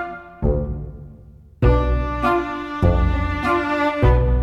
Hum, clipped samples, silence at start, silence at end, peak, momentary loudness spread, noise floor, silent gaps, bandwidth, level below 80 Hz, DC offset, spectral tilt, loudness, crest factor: none; under 0.1%; 0 s; 0 s; -4 dBFS; 12 LU; -44 dBFS; none; 6.6 kHz; -24 dBFS; under 0.1%; -8.5 dB/octave; -20 LUFS; 16 dB